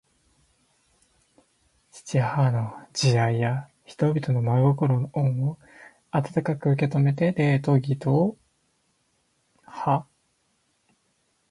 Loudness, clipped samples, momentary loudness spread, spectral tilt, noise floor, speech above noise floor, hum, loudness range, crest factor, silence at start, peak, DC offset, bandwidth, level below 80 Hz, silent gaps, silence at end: -24 LUFS; under 0.1%; 9 LU; -7 dB/octave; -70 dBFS; 47 dB; none; 5 LU; 18 dB; 1.95 s; -8 dBFS; under 0.1%; 11.5 kHz; -62 dBFS; none; 1.5 s